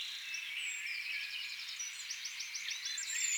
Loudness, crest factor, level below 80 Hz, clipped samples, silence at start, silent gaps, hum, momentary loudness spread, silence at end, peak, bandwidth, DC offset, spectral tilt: -39 LUFS; 16 dB; under -90 dBFS; under 0.1%; 0 s; none; none; 4 LU; 0 s; -24 dBFS; over 20 kHz; under 0.1%; 5.5 dB/octave